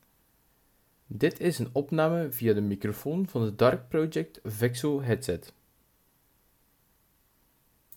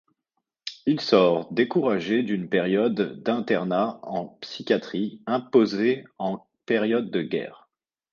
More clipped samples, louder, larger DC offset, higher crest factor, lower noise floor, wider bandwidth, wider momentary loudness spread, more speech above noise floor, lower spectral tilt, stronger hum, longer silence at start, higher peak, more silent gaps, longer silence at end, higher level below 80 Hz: neither; second, -29 LUFS vs -24 LUFS; neither; about the same, 20 dB vs 20 dB; second, -68 dBFS vs -81 dBFS; first, 19 kHz vs 7.2 kHz; second, 8 LU vs 12 LU; second, 40 dB vs 57 dB; about the same, -6.5 dB/octave vs -6.5 dB/octave; neither; first, 1.1 s vs 0.65 s; second, -10 dBFS vs -4 dBFS; neither; first, 2.45 s vs 0.6 s; first, -62 dBFS vs -70 dBFS